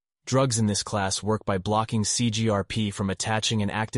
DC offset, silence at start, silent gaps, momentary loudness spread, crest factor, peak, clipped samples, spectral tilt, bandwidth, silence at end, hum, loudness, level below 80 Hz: under 0.1%; 0.25 s; none; 4 LU; 16 dB; -10 dBFS; under 0.1%; -4.5 dB/octave; 11.5 kHz; 0 s; none; -25 LUFS; -52 dBFS